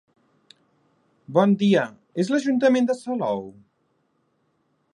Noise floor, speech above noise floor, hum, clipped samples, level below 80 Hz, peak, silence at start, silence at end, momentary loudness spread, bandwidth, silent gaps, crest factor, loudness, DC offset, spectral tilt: -69 dBFS; 48 dB; none; under 0.1%; -72 dBFS; -4 dBFS; 1.3 s; 1.4 s; 11 LU; 10.5 kHz; none; 20 dB; -22 LUFS; under 0.1%; -6.5 dB/octave